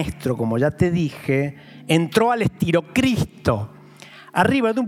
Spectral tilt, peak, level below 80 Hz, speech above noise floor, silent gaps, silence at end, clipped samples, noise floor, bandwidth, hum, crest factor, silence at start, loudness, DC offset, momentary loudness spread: -6.5 dB/octave; -4 dBFS; -48 dBFS; 24 dB; none; 0 s; under 0.1%; -44 dBFS; 16 kHz; none; 18 dB; 0 s; -21 LUFS; under 0.1%; 8 LU